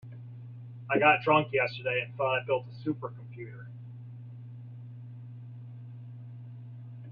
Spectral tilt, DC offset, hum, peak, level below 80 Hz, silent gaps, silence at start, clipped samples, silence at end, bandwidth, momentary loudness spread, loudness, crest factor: -8.5 dB/octave; under 0.1%; none; -10 dBFS; -72 dBFS; none; 0.05 s; under 0.1%; 0 s; 5.2 kHz; 21 LU; -28 LUFS; 22 dB